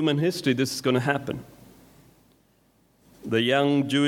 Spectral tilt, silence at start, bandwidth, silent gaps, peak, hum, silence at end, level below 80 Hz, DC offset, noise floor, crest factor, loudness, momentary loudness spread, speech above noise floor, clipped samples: -5.5 dB/octave; 0 s; 16.5 kHz; none; -8 dBFS; none; 0 s; -64 dBFS; under 0.1%; -63 dBFS; 18 dB; -24 LUFS; 13 LU; 40 dB; under 0.1%